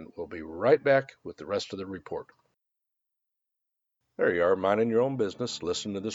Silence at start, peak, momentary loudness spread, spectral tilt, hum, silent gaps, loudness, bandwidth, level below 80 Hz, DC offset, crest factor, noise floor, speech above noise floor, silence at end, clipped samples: 0 s; -10 dBFS; 15 LU; -5 dB/octave; none; none; -27 LUFS; 8 kHz; -66 dBFS; under 0.1%; 20 dB; -85 dBFS; 57 dB; 0 s; under 0.1%